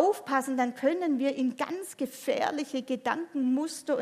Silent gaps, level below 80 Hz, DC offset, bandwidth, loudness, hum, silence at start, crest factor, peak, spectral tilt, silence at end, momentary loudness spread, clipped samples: none; -82 dBFS; under 0.1%; 15.5 kHz; -30 LUFS; none; 0 s; 18 dB; -10 dBFS; -3.5 dB/octave; 0 s; 7 LU; under 0.1%